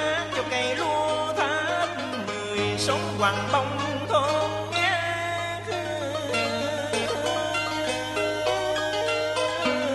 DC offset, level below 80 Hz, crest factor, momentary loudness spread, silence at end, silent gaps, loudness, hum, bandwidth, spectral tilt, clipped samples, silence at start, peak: under 0.1%; -56 dBFS; 18 dB; 5 LU; 0 s; none; -26 LUFS; none; 12 kHz; -3.5 dB/octave; under 0.1%; 0 s; -8 dBFS